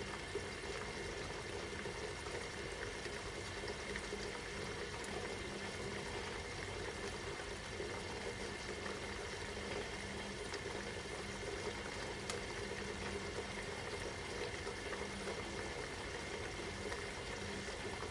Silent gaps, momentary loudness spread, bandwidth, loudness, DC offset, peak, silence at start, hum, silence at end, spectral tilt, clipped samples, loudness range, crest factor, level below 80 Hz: none; 1 LU; 11.5 kHz; -44 LUFS; under 0.1%; -26 dBFS; 0 s; none; 0 s; -3.5 dB/octave; under 0.1%; 1 LU; 18 dB; -56 dBFS